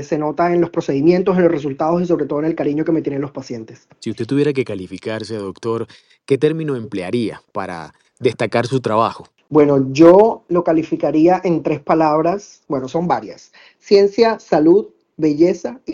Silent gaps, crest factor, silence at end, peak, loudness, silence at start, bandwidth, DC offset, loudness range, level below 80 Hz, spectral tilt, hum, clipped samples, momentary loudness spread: none; 16 dB; 0 s; 0 dBFS; -17 LUFS; 0 s; 10.5 kHz; under 0.1%; 8 LU; -56 dBFS; -7.5 dB/octave; none; under 0.1%; 14 LU